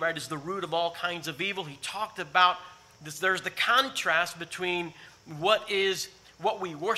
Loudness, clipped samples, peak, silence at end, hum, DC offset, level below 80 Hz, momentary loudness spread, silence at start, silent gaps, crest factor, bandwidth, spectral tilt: -28 LUFS; under 0.1%; -6 dBFS; 0 s; none; under 0.1%; -72 dBFS; 12 LU; 0 s; none; 22 dB; 16 kHz; -2.5 dB/octave